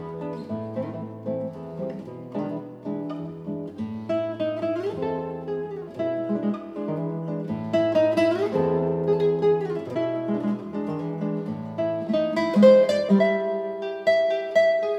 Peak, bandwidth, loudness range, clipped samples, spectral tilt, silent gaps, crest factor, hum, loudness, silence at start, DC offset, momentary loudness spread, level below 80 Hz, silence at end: -6 dBFS; 11 kHz; 10 LU; under 0.1%; -7.5 dB/octave; none; 20 dB; none; -25 LUFS; 0 s; under 0.1%; 13 LU; -64 dBFS; 0 s